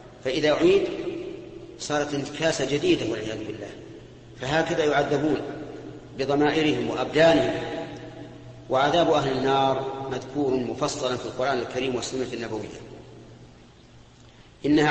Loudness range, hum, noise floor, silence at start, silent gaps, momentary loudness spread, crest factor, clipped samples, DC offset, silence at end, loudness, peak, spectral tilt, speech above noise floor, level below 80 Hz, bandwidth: 6 LU; none; -51 dBFS; 0 s; none; 19 LU; 18 dB; under 0.1%; under 0.1%; 0 s; -25 LUFS; -8 dBFS; -5 dB/octave; 27 dB; -54 dBFS; 8.8 kHz